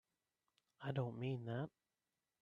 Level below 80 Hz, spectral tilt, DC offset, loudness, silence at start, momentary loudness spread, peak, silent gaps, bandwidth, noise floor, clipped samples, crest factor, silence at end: -84 dBFS; -9 dB/octave; under 0.1%; -46 LUFS; 0.8 s; 8 LU; -28 dBFS; none; 4.8 kHz; under -90 dBFS; under 0.1%; 18 dB; 0.75 s